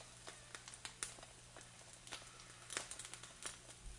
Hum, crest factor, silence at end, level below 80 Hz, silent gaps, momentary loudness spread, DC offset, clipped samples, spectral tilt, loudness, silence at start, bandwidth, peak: none; 32 dB; 0 s; -66 dBFS; none; 10 LU; under 0.1%; under 0.1%; -1 dB/octave; -51 LUFS; 0 s; 11.5 kHz; -22 dBFS